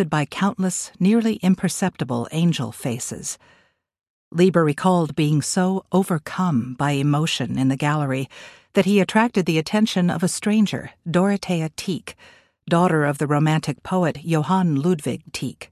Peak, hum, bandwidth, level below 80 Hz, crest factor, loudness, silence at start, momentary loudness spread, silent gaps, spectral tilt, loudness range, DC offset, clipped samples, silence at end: -4 dBFS; none; 14 kHz; -58 dBFS; 16 dB; -21 LUFS; 0 s; 9 LU; 4.10-4.31 s; -5.5 dB/octave; 2 LU; under 0.1%; under 0.1%; 0.05 s